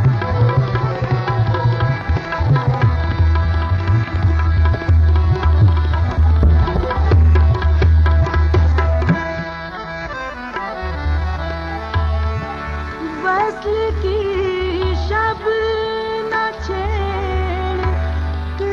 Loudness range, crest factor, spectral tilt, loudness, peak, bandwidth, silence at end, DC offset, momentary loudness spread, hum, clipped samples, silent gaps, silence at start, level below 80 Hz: 7 LU; 14 dB; -8 dB/octave; -18 LUFS; -2 dBFS; 6.4 kHz; 0 s; under 0.1%; 10 LU; none; under 0.1%; none; 0 s; -18 dBFS